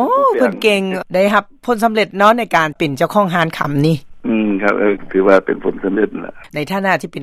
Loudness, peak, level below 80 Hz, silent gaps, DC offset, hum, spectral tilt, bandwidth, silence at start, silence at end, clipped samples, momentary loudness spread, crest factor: -15 LUFS; 0 dBFS; -48 dBFS; none; under 0.1%; none; -6 dB/octave; 15.5 kHz; 0 s; 0 s; under 0.1%; 8 LU; 14 dB